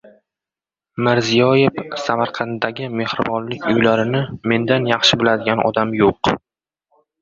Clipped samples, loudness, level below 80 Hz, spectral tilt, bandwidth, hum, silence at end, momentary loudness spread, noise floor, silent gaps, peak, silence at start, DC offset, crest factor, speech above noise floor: under 0.1%; -17 LUFS; -50 dBFS; -5 dB/octave; 7.8 kHz; none; 0.85 s; 9 LU; -90 dBFS; none; 0 dBFS; 0.95 s; under 0.1%; 18 dB; 72 dB